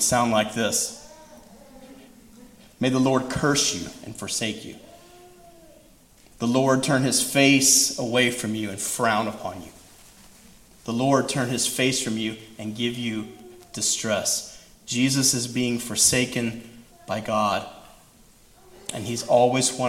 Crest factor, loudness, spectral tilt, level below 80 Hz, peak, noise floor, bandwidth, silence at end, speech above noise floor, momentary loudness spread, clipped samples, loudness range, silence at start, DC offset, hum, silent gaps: 22 dB; -22 LUFS; -3 dB/octave; -56 dBFS; -4 dBFS; -54 dBFS; 16.5 kHz; 0 s; 30 dB; 17 LU; under 0.1%; 6 LU; 0 s; under 0.1%; none; none